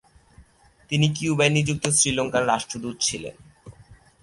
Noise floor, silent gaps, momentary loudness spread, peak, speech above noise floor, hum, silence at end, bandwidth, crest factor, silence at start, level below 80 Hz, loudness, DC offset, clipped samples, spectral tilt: -55 dBFS; none; 10 LU; -4 dBFS; 32 dB; none; 0.3 s; 11.5 kHz; 20 dB; 0.4 s; -52 dBFS; -22 LUFS; under 0.1%; under 0.1%; -3.5 dB/octave